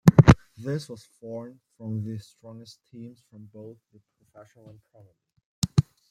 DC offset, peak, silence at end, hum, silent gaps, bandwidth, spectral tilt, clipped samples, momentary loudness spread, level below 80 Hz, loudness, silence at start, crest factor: under 0.1%; -2 dBFS; 0.3 s; none; 5.45-5.62 s; 15 kHz; -7.5 dB/octave; under 0.1%; 27 LU; -42 dBFS; -24 LUFS; 0.05 s; 24 dB